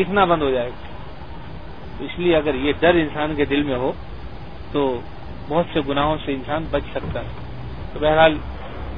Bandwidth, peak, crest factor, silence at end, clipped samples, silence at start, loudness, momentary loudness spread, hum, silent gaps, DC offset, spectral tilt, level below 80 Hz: 5.2 kHz; -2 dBFS; 20 dB; 0 s; under 0.1%; 0 s; -21 LUFS; 20 LU; none; none; 2%; -9 dB/octave; -36 dBFS